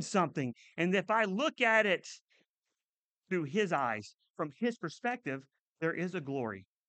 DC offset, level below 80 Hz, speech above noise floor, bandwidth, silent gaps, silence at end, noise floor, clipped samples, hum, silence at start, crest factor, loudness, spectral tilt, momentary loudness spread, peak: under 0.1%; -84 dBFS; over 57 dB; 9 kHz; 2.22-2.28 s, 2.48-2.62 s, 2.85-3.22 s, 4.30-4.34 s, 5.59-5.76 s; 0.25 s; under -90 dBFS; under 0.1%; none; 0 s; 20 dB; -33 LUFS; -5 dB/octave; 13 LU; -14 dBFS